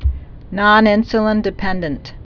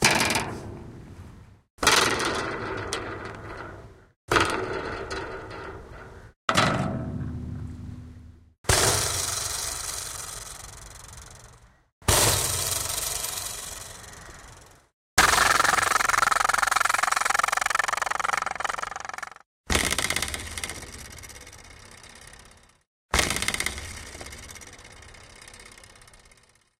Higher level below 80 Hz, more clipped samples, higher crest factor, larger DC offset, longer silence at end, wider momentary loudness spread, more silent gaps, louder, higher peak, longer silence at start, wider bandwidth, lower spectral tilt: first, -28 dBFS vs -44 dBFS; neither; second, 16 dB vs 26 dB; neither; second, 0.1 s vs 0.65 s; second, 17 LU vs 25 LU; second, none vs 1.70-1.78 s, 4.16-4.28 s, 6.36-6.48 s, 8.58-8.64 s, 11.92-12.01 s, 14.93-15.17 s, 19.46-19.64 s, 22.87-23.09 s; first, -15 LUFS vs -24 LUFS; about the same, 0 dBFS vs -2 dBFS; about the same, 0 s vs 0 s; second, 5.4 kHz vs 16.5 kHz; first, -7.5 dB/octave vs -2 dB/octave